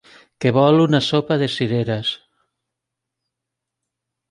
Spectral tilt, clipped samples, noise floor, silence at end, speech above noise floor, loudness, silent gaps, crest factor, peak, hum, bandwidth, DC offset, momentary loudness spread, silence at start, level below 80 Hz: -6.5 dB/octave; under 0.1%; -82 dBFS; 2.15 s; 65 dB; -18 LUFS; none; 18 dB; -2 dBFS; none; 11 kHz; under 0.1%; 9 LU; 0.4 s; -60 dBFS